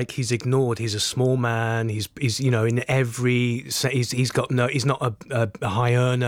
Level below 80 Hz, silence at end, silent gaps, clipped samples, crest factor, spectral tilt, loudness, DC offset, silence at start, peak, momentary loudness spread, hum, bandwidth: -58 dBFS; 0 s; none; under 0.1%; 12 dB; -5 dB/octave; -23 LUFS; under 0.1%; 0 s; -10 dBFS; 4 LU; none; 16 kHz